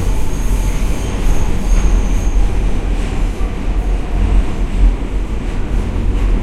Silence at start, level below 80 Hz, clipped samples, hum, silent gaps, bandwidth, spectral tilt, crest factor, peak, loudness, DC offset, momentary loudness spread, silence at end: 0 s; -14 dBFS; under 0.1%; none; none; 12.5 kHz; -6 dB/octave; 12 dB; 0 dBFS; -19 LUFS; under 0.1%; 4 LU; 0 s